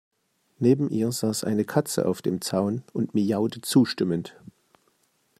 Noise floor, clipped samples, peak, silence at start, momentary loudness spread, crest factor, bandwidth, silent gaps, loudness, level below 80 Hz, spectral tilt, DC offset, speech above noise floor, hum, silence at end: -68 dBFS; under 0.1%; -6 dBFS; 0.6 s; 6 LU; 18 dB; 15 kHz; none; -25 LUFS; -68 dBFS; -5.5 dB/octave; under 0.1%; 43 dB; none; 1.1 s